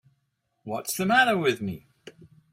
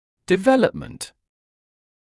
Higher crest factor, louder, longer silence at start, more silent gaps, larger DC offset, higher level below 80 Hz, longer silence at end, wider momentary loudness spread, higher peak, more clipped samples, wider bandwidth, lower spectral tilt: about the same, 20 dB vs 18 dB; second, -24 LUFS vs -19 LUFS; first, 0.65 s vs 0.3 s; neither; neither; second, -68 dBFS vs -54 dBFS; second, 0.25 s vs 1.1 s; about the same, 19 LU vs 18 LU; second, -8 dBFS vs -4 dBFS; neither; first, 16 kHz vs 12 kHz; second, -4 dB/octave vs -5.5 dB/octave